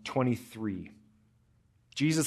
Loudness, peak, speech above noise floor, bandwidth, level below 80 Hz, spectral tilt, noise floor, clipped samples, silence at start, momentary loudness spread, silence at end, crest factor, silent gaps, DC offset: -33 LUFS; -14 dBFS; 37 dB; 13.5 kHz; -70 dBFS; -5 dB/octave; -67 dBFS; under 0.1%; 0.05 s; 12 LU; 0 s; 18 dB; none; under 0.1%